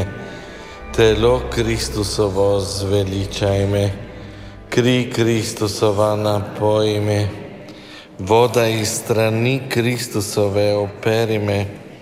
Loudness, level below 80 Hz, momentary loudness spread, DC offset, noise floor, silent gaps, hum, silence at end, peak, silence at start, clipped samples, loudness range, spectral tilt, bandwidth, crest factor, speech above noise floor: -18 LUFS; -38 dBFS; 18 LU; under 0.1%; -38 dBFS; none; none; 0 s; -2 dBFS; 0 s; under 0.1%; 2 LU; -5.5 dB/octave; 16 kHz; 16 dB; 20 dB